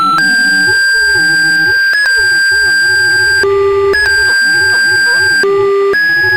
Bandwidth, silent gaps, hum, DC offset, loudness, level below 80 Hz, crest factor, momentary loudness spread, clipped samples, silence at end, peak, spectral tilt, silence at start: over 20 kHz; none; none; 0.7%; -8 LUFS; -42 dBFS; 6 dB; 2 LU; under 0.1%; 0 s; -2 dBFS; -1.5 dB/octave; 0 s